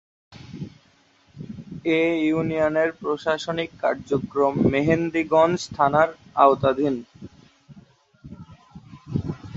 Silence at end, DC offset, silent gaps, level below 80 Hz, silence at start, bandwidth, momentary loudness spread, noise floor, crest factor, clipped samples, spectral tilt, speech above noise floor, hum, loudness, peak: 0 s; under 0.1%; none; -52 dBFS; 0.3 s; 8 kHz; 20 LU; -59 dBFS; 22 dB; under 0.1%; -6.5 dB/octave; 38 dB; none; -22 LUFS; -2 dBFS